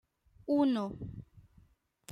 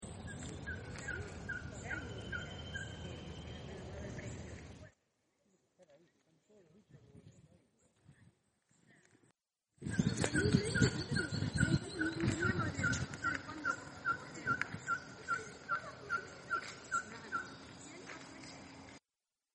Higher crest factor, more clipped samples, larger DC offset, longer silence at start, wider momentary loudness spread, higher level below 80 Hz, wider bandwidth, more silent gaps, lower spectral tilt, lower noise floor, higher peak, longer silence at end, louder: second, 18 dB vs 26 dB; neither; neither; first, 0.45 s vs 0 s; first, 20 LU vs 17 LU; about the same, -62 dBFS vs -58 dBFS; second, 6.4 kHz vs 10 kHz; neither; first, -7 dB/octave vs -5 dB/octave; second, -66 dBFS vs under -90 dBFS; about the same, -18 dBFS vs -16 dBFS; second, 0 s vs 0.55 s; first, -32 LUFS vs -39 LUFS